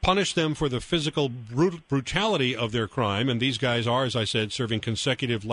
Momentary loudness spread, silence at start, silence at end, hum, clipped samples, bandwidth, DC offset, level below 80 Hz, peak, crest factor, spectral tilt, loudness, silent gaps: 4 LU; 0 s; 0 s; none; under 0.1%; 10.5 kHz; under 0.1%; -46 dBFS; -6 dBFS; 20 dB; -5 dB/octave; -26 LUFS; none